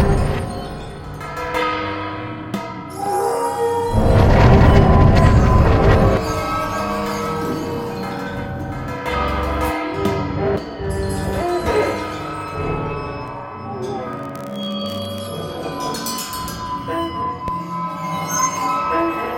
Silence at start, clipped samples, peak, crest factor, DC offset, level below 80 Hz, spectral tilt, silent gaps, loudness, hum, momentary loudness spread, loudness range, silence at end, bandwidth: 0 s; under 0.1%; 0 dBFS; 18 dB; under 0.1%; -26 dBFS; -6 dB/octave; none; -19 LUFS; none; 14 LU; 12 LU; 0 s; 17 kHz